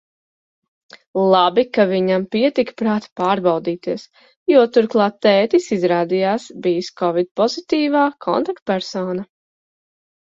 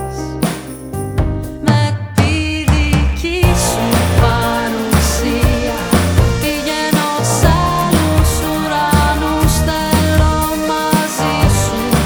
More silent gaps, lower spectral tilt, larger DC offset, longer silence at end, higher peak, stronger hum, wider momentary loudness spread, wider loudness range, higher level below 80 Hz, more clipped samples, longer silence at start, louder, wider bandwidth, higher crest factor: first, 3.12-3.16 s, 4.36-4.46 s, 7.31-7.35 s, 8.62-8.66 s vs none; about the same, -6 dB/octave vs -5 dB/octave; neither; first, 1 s vs 0 s; about the same, 0 dBFS vs 0 dBFS; neither; first, 9 LU vs 6 LU; about the same, 3 LU vs 1 LU; second, -64 dBFS vs -20 dBFS; neither; first, 1.15 s vs 0 s; second, -18 LUFS vs -14 LUFS; second, 7.8 kHz vs over 20 kHz; about the same, 18 dB vs 14 dB